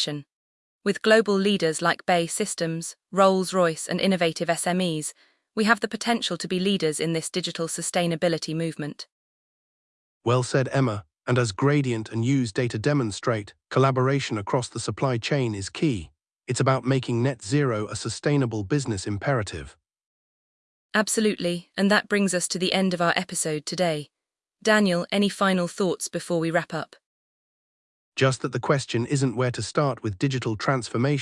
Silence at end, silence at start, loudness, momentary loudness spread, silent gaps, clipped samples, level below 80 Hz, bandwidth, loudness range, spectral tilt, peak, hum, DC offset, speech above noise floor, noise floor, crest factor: 0 s; 0 s; -24 LUFS; 8 LU; 0.33-0.81 s, 9.12-10.21 s, 20.06-20.90 s, 27.06-28.12 s; under 0.1%; -60 dBFS; 12 kHz; 4 LU; -5 dB/octave; -4 dBFS; none; under 0.1%; 39 dB; -63 dBFS; 20 dB